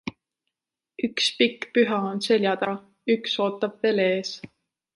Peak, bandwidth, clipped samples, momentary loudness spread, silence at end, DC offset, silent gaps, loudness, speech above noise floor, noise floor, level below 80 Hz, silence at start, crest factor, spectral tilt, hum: -8 dBFS; 11.5 kHz; under 0.1%; 10 LU; 0.5 s; under 0.1%; none; -24 LUFS; 64 dB; -87 dBFS; -70 dBFS; 0.05 s; 18 dB; -4.5 dB/octave; none